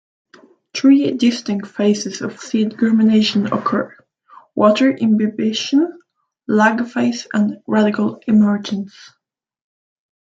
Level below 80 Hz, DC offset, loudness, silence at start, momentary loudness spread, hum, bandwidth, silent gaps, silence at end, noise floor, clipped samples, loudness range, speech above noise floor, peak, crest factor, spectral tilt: -64 dBFS; under 0.1%; -17 LUFS; 0.75 s; 12 LU; none; 7.8 kHz; none; 1.35 s; -47 dBFS; under 0.1%; 2 LU; 31 dB; -2 dBFS; 16 dB; -5.5 dB/octave